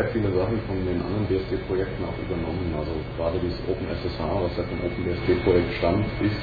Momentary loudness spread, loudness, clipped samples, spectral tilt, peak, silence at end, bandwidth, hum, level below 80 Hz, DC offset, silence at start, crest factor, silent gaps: 7 LU; -26 LUFS; under 0.1%; -9.5 dB/octave; -8 dBFS; 0 s; 4.9 kHz; none; -38 dBFS; under 0.1%; 0 s; 18 dB; none